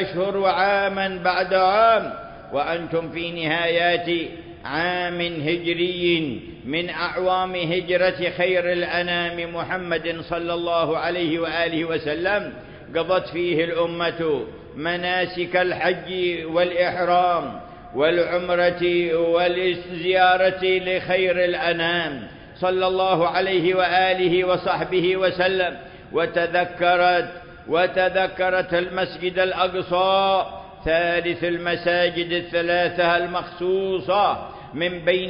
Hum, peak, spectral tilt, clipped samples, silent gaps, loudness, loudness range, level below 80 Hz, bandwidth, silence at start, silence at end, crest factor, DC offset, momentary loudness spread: none; -6 dBFS; -9.5 dB/octave; under 0.1%; none; -21 LUFS; 4 LU; -52 dBFS; 5.4 kHz; 0 s; 0 s; 16 dB; under 0.1%; 8 LU